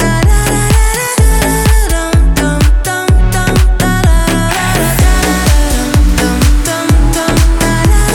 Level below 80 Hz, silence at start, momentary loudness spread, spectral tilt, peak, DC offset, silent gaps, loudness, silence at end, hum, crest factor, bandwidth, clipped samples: -10 dBFS; 0 s; 2 LU; -4.5 dB/octave; 0 dBFS; under 0.1%; none; -11 LUFS; 0 s; none; 8 dB; 18 kHz; under 0.1%